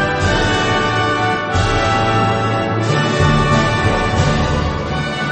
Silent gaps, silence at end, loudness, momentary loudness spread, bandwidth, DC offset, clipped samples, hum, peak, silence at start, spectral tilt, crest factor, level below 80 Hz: none; 0 s; -15 LUFS; 4 LU; 8.8 kHz; under 0.1%; under 0.1%; none; 0 dBFS; 0 s; -5.5 dB/octave; 14 dB; -28 dBFS